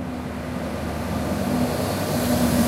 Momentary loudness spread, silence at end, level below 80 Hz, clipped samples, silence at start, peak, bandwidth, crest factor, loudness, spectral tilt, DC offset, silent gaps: 9 LU; 0 s; -38 dBFS; under 0.1%; 0 s; -8 dBFS; 16 kHz; 16 dB; -25 LUFS; -5.5 dB/octave; under 0.1%; none